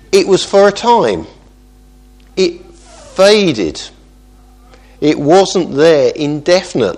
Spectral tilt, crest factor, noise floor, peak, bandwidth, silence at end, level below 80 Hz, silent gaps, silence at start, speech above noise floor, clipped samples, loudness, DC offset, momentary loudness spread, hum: -4.5 dB/octave; 12 dB; -42 dBFS; 0 dBFS; 12.5 kHz; 0 s; -42 dBFS; none; 0.1 s; 31 dB; 0.2%; -11 LUFS; under 0.1%; 12 LU; 50 Hz at -45 dBFS